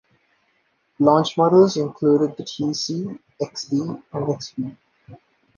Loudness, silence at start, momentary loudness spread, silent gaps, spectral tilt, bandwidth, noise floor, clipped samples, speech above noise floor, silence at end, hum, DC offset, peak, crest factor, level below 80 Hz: -21 LUFS; 1 s; 15 LU; none; -6.5 dB/octave; 7.2 kHz; -66 dBFS; under 0.1%; 46 dB; 0.45 s; none; under 0.1%; -2 dBFS; 20 dB; -66 dBFS